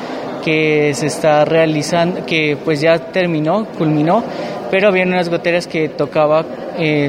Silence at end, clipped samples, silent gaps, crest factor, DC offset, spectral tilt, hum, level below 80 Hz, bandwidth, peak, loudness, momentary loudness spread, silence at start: 0 s; under 0.1%; none; 14 dB; under 0.1%; -5.5 dB/octave; none; -56 dBFS; 15.5 kHz; 0 dBFS; -15 LUFS; 6 LU; 0 s